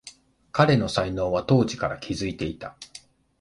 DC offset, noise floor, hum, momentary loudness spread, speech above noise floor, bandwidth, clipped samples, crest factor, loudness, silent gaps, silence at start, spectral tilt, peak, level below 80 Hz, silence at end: under 0.1%; -50 dBFS; none; 18 LU; 26 dB; 11.5 kHz; under 0.1%; 22 dB; -24 LUFS; none; 0.05 s; -6 dB/octave; -2 dBFS; -48 dBFS; 0.45 s